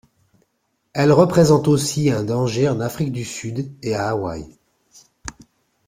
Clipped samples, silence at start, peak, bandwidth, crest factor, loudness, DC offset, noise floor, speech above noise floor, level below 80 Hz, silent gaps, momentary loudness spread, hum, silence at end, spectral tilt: under 0.1%; 0.95 s; -2 dBFS; 16 kHz; 18 dB; -19 LUFS; under 0.1%; -70 dBFS; 52 dB; -50 dBFS; none; 20 LU; none; 0.55 s; -6 dB/octave